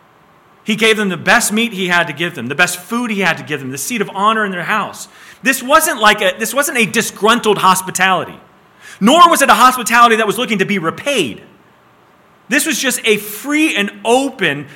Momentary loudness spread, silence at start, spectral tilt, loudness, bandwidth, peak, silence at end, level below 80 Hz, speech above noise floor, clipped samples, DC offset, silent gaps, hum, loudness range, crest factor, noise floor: 10 LU; 0.65 s; -3 dB/octave; -13 LUFS; 18 kHz; 0 dBFS; 0 s; -54 dBFS; 34 dB; 0.3%; under 0.1%; none; none; 5 LU; 14 dB; -48 dBFS